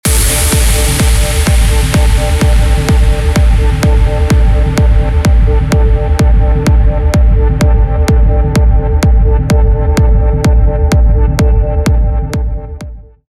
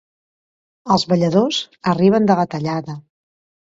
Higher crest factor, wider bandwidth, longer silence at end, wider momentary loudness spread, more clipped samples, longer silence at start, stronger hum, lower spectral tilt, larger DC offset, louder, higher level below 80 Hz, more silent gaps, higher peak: second, 8 dB vs 18 dB; first, 15 kHz vs 7.8 kHz; second, 0.25 s vs 0.75 s; second, 2 LU vs 16 LU; neither; second, 0.05 s vs 0.85 s; neither; about the same, -5.5 dB/octave vs -6.5 dB/octave; neither; first, -11 LUFS vs -17 LUFS; first, -10 dBFS vs -56 dBFS; neither; about the same, 0 dBFS vs 0 dBFS